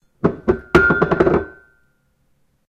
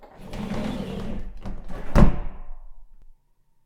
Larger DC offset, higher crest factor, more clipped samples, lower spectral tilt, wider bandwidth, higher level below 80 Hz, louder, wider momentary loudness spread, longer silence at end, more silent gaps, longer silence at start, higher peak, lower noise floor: neither; second, 18 dB vs 24 dB; neither; about the same, -7.5 dB/octave vs -8 dB/octave; first, 9.4 kHz vs 8 kHz; second, -36 dBFS vs -28 dBFS; first, -17 LUFS vs -26 LUFS; second, 8 LU vs 20 LU; first, 1.2 s vs 0.55 s; neither; first, 0.25 s vs 0 s; about the same, 0 dBFS vs 0 dBFS; about the same, -63 dBFS vs -61 dBFS